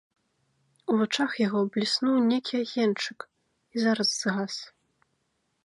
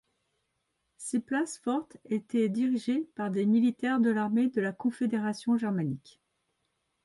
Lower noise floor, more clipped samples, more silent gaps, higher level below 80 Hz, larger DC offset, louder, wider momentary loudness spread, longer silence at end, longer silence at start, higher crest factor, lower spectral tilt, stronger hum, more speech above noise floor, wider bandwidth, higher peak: second, -75 dBFS vs -79 dBFS; neither; neither; about the same, -76 dBFS vs -74 dBFS; neither; first, -27 LUFS vs -30 LUFS; first, 13 LU vs 8 LU; about the same, 0.95 s vs 1.05 s; about the same, 0.9 s vs 1 s; about the same, 18 dB vs 14 dB; second, -4 dB/octave vs -6 dB/octave; neither; about the same, 49 dB vs 51 dB; about the same, 11.5 kHz vs 11.5 kHz; first, -12 dBFS vs -16 dBFS